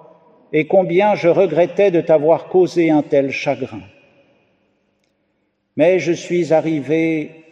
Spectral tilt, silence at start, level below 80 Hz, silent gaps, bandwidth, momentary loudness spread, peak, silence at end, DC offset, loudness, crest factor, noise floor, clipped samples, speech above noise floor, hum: -7 dB/octave; 0.5 s; -66 dBFS; none; 8.4 kHz; 8 LU; -2 dBFS; 0.25 s; under 0.1%; -16 LUFS; 14 dB; -67 dBFS; under 0.1%; 52 dB; 50 Hz at -60 dBFS